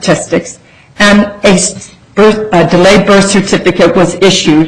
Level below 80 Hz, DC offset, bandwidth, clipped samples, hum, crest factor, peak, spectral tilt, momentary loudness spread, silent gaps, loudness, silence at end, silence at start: -34 dBFS; under 0.1%; 11.5 kHz; 0.3%; none; 8 dB; 0 dBFS; -4.5 dB/octave; 9 LU; none; -7 LUFS; 0 s; 0 s